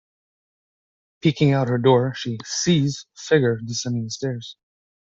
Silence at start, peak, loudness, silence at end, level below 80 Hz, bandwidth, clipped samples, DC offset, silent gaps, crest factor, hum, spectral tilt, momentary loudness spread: 1.25 s; -4 dBFS; -21 LUFS; 0.6 s; -60 dBFS; 7.8 kHz; under 0.1%; under 0.1%; none; 18 dB; none; -5.5 dB/octave; 11 LU